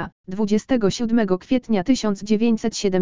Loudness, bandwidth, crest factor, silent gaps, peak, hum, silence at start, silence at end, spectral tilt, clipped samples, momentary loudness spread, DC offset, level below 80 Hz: -21 LUFS; 7.6 kHz; 14 dB; 0.12-0.24 s; -6 dBFS; none; 0 s; 0 s; -5.5 dB/octave; under 0.1%; 3 LU; 2%; -48 dBFS